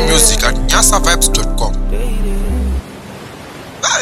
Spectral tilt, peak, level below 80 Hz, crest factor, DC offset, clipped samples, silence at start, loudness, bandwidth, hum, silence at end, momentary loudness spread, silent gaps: -2.5 dB/octave; 0 dBFS; -16 dBFS; 14 dB; under 0.1%; under 0.1%; 0 s; -13 LUFS; 15.5 kHz; none; 0 s; 21 LU; none